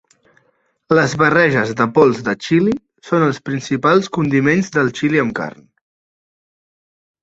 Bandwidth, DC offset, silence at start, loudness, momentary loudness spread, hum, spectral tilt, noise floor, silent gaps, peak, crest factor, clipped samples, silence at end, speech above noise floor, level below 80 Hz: 8 kHz; under 0.1%; 0.9 s; -16 LUFS; 8 LU; none; -6 dB/octave; -62 dBFS; none; 0 dBFS; 18 dB; under 0.1%; 1.7 s; 47 dB; -54 dBFS